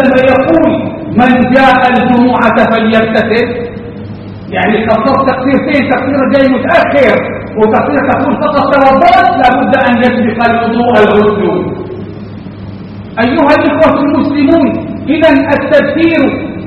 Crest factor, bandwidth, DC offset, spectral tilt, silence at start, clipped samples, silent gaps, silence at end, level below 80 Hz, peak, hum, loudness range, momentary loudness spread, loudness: 8 dB; 7.8 kHz; under 0.1%; -7.5 dB/octave; 0 s; 1%; none; 0 s; -36 dBFS; 0 dBFS; none; 3 LU; 15 LU; -8 LUFS